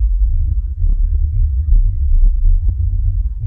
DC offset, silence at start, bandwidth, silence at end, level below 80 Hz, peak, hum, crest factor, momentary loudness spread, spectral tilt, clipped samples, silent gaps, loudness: 0.9%; 0 s; 0.5 kHz; 0 s; -12 dBFS; -2 dBFS; none; 10 dB; 3 LU; -12.5 dB/octave; under 0.1%; none; -18 LUFS